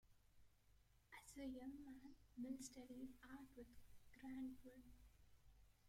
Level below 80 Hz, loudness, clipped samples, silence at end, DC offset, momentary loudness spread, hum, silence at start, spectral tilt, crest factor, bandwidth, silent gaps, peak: -74 dBFS; -58 LUFS; under 0.1%; 0 s; under 0.1%; 11 LU; 50 Hz at -80 dBFS; 0.05 s; -4.5 dB/octave; 18 dB; 16.5 kHz; none; -42 dBFS